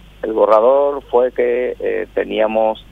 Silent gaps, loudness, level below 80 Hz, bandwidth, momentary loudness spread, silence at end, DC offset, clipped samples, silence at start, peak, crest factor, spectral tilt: none; -16 LUFS; -46 dBFS; 5 kHz; 9 LU; 0.1 s; under 0.1%; under 0.1%; 0.25 s; 0 dBFS; 14 dB; -6.5 dB/octave